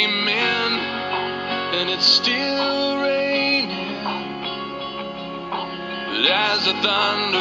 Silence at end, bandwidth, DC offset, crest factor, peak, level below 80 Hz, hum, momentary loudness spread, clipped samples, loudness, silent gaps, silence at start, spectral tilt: 0 s; 7.6 kHz; under 0.1%; 20 dB; -2 dBFS; -58 dBFS; none; 12 LU; under 0.1%; -20 LUFS; none; 0 s; -3 dB/octave